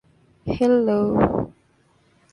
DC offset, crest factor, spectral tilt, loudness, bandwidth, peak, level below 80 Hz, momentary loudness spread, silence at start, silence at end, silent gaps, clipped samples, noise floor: under 0.1%; 20 dB; -8.5 dB/octave; -20 LUFS; 10.5 kHz; -2 dBFS; -44 dBFS; 15 LU; 0.45 s; 0.85 s; none; under 0.1%; -60 dBFS